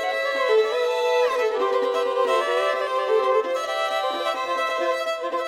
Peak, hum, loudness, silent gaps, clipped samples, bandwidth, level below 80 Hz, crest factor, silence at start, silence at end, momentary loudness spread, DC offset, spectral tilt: -10 dBFS; none; -22 LUFS; none; under 0.1%; 15.5 kHz; -70 dBFS; 14 dB; 0 s; 0 s; 4 LU; under 0.1%; -0.5 dB/octave